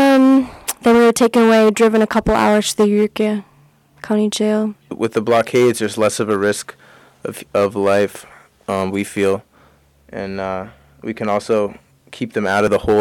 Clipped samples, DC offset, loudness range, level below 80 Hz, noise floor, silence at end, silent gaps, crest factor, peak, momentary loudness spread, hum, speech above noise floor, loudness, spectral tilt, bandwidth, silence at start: under 0.1%; under 0.1%; 9 LU; -44 dBFS; -52 dBFS; 0 s; none; 12 dB; -6 dBFS; 17 LU; none; 36 dB; -16 LUFS; -5 dB/octave; 18 kHz; 0 s